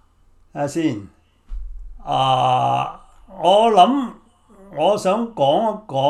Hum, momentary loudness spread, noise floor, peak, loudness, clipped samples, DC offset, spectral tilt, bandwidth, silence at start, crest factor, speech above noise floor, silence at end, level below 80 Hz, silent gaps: none; 23 LU; -53 dBFS; 0 dBFS; -18 LUFS; under 0.1%; under 0.1%; -5.5 dB/octave; 13 kHz; 0.55 s; 20 dB; 36 dB; 0 s; -40 dBFS; none